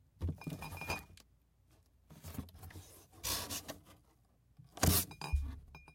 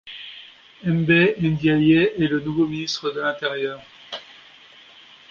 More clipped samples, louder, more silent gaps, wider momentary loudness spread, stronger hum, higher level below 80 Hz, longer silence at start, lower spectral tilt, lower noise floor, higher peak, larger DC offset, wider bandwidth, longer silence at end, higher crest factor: neither; second, -38 LUFS vs -20 LUFS; neither; first, 23 LU vs 19 LU; neither; about the same, -50 dBFS vs -54 dBFS; first, 0.2 s vs 0.05 s; second, -3.5 dB/octave vs -6.5 dB/octave; first, -70 dBFS vs -48 dBFS; second, -12 dBFS vs -4 dBFS; neither; first, 16.5 kHz vs 7 kHz; second, 0 s vs 1.05 s; first, 30 dB vs 18 dB